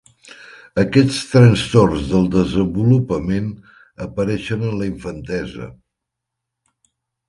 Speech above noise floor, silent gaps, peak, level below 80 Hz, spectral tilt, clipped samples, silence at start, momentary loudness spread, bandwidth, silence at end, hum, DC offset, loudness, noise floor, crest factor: 64 dB; none; 0 dBFS; -40 dBFS; -7 dB/octave; under 0.1%; 0.25 s; 17 LU; 11.5 kHz; 1.55 s; none; under 0.1%; -17 LUFS; -81 dBFS; 18 dB